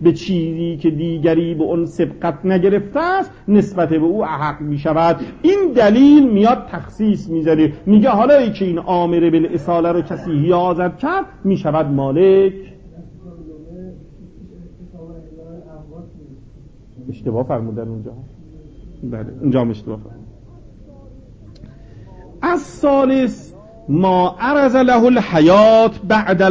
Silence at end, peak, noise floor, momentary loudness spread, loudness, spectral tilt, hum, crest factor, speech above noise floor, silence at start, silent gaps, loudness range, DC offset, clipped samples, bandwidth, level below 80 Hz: 0 s; -2 dBFS; -41 dBFS; 17 LU; -15 LUFS; -8 dB/octave; none; 14 dB; 27 dB; 0 s; none; 14 LU; under 0.1%; under 0.1%; 7.8 kHz; -44 dBFS